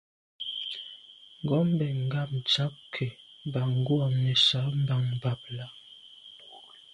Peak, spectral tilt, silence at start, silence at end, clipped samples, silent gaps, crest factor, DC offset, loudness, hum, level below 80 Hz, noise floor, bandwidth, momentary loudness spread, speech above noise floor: -10 dBFS; -6 dB/octave; 0.4 s; 0.3 s; under 0.1%; none; 18 dB; under 0.1%; -28 LUFS; none; -64 dBFS; -51 dBFS; 10.5 kHz; 24 LU; 24 dB